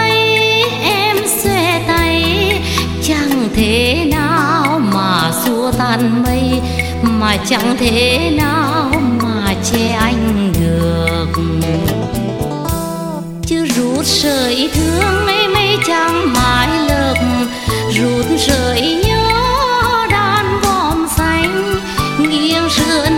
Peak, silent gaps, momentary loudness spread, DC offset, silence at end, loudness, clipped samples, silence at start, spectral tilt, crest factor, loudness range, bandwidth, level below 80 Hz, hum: 0 dBFS; none; 5 LU; under 0.1%; 0 s; -13 LUFS; under 0.1%; 0 s; -4.5 dB/octave; 14 dB; 3 LU; 17 kHz; -28 dBFS; none